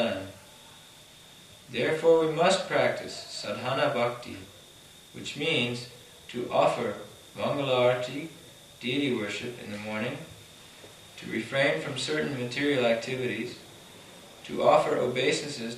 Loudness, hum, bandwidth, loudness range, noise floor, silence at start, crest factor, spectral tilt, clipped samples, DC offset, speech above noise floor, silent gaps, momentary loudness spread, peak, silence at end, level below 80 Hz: -28 LUFS; none; 14.5 kHz; 5 LU; -52 dBFS; 0 s; 22 dB; -4.5 dB/octave; under 0.1%; under 0.1%; 24 dB; none; 24 LU; -8 dBFS; 0 s; -68 dBFS